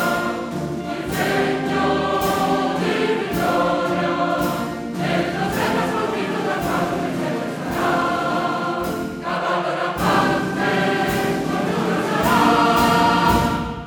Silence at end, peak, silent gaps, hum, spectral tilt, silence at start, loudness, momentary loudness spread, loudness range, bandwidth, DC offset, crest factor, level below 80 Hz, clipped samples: 0 s; -2 dBFS; none; none; -5 dB/octave; 0 s; -20 LUFS; 9 LU; 4 LU; 19 kHz; under 0.1%; 18 dB; -42 dBFS; under 0.1%